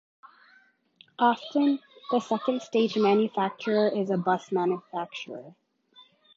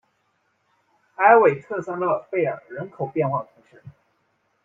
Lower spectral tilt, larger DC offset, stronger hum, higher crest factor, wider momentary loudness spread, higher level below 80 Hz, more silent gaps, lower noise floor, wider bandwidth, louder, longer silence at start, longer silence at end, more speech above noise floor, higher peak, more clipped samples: second, -6.5 dB/octave vs -9 dB/octave; neither; neither; about the same, 20 dB vs 22 dB; second, 11 LU vs 17 LU; second, -80 dBFS vs -68 dBFS; neither; second, -62 dBFS vs -69 dBFS; about the same, 7.6 kHz vs 7.2 kHz; second, -27 LUFS vs -21 LUFS; about the same, 1.2 s vs 1.2 s; about the same, 0.85 s vs 0.75 s; second, 36 dB vs 48 dB; second, -8 dBFS vs -2 dBFS; neither